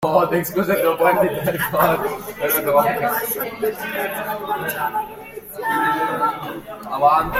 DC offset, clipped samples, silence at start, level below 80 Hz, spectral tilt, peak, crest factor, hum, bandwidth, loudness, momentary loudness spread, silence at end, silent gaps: under 0.1%; under 0.1%; 0 s; -48 dBFS; -4.5 dB/octave; -2 dBFS; 18 dB; none; 16.5 kHz; -20 LUFS; 11 LU; 0 s; none